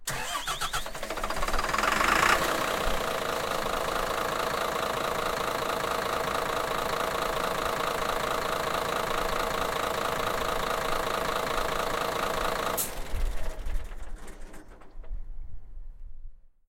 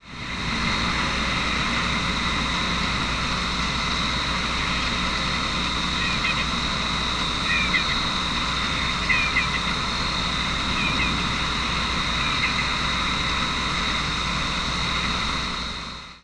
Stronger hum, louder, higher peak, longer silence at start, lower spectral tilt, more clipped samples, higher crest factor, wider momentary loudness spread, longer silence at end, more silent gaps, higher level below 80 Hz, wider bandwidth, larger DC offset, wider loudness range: neither; second, -29 LUFS vs -23 LUFS; about the same, -8 dBFS vs -8 dBFS; about the same, 0 s vs 0 s; about the same, -2.5 dB/octave vs -3 dB/octave; neither; first, 22 dB vs 16 dB; first, 14 LU vs 3 LU; first, 0.2 s vs 0.05 s; neither; second, -40 dBFS vs -34 dBFS; first, 17 kHz vs 11 kHz; neither; first, 7 LU vs 1 LU